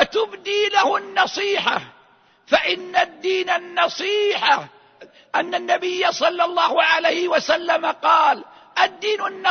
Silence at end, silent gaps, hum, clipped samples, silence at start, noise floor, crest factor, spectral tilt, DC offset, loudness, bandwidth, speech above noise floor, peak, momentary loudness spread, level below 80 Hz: 0 s; none; none; under 0.1%; 0 s; -55 dBFS; 18 dB; -2 dB/octave; under 0.1%; -19 LUFS; 6.6 kHz; 35 dB; -2 dBFS; 6 LU; -64 dBFS